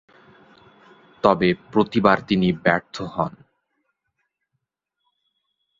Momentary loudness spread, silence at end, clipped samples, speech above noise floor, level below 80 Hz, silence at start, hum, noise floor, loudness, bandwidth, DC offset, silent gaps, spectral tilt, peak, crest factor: 9 LU; 2.5 s; under 0.1%; 60 dB; -54 dBFS; 1.25 s; none; -80 dBFS; -21 LUFS; 7.6 kHz; under 0.1%; none; -7 dB/octave; -2 dBFS; 22 dB